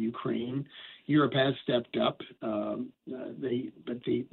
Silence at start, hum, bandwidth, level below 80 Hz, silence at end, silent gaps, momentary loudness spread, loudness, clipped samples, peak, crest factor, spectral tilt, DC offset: 0 s; none; 4.3 kHz; -72 dBFS; 0.05 s; none; 14 LU; -32 LUFS; under 0.1%; -14 dBFS; 18 dB; -4.5 dB/octave; under 0.1%